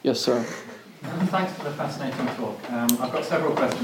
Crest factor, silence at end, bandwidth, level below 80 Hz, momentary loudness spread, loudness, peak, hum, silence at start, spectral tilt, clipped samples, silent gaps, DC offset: 26 dB; 0 s; 17 kHz; -72 dBFS; 11 LU; -26 LUFS; 0 dBFS; none; 0.05 s; -4.5 dB/octave; under 0.1%; none; under 0.1%